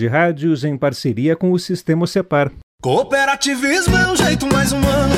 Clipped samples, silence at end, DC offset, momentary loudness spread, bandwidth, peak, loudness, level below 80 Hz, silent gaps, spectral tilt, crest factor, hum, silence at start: under 0.1%; 0 s; under 0.1%; 5 LU; 16.5 kHz; -2 dBFS; -16 LUFS; -32 dBFS; 2.63-2.78 s; -5 dB/octave; 14 dB; none; 0 s